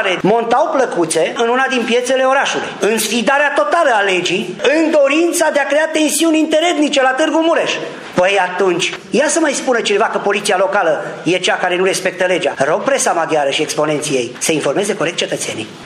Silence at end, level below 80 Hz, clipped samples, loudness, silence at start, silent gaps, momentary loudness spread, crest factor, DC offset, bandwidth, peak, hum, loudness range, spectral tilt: 0 s; -62 dBFS; under 0.1%; -14 LUFS; 0 s; none; 5 LU; 14 dB; under 0.1%; 15 kHz; 0 dBFS; none; 2 LU; -3 dB/octave